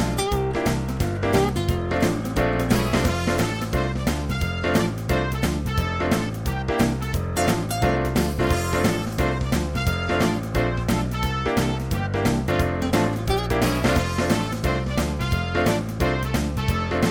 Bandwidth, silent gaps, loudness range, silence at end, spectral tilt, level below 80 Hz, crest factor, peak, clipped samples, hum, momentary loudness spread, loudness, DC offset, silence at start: 17.5 kHz; none; 1 LU; 0 s; -5.5 dB/octave; -32 dBFS; 16 dB; -6 dBFS; under 0.1%; none; 3 LU; -23 LUFS; under 0.1%; 0 s